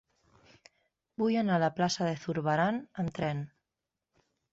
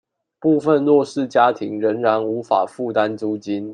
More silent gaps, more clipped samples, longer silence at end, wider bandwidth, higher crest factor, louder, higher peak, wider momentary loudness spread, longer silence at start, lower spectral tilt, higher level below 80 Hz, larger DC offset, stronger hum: neither; neither; first, 1.05 s vs 0 s; second, 8 kHz vs 10 kHz; about the same, 18 dB vs 16 dB; second, -31 LUFS vs -19 LUFS; second, -16 dBFS vs -2 dBFS; first, 10 LU vs 7 LU; first, 1.2 s vs 0.4 s; about the same, -6 dB/octave vs -6.5 dB/octave; about the same, -66 dBFS vs -70 dBFS; neither; neither